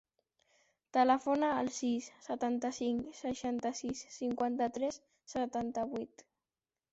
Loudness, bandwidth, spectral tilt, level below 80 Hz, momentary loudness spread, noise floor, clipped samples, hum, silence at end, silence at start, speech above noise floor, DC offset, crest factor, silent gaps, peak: -35 LUFS; 8 kHz; -4 dB/octave; -70 dBFS; 11 LU; under -90 dBFS; under 0.1%; none; 0.85 s; 0.95 s; over 55 dB; under 0.1%; 20 dB; none; -16 dBFS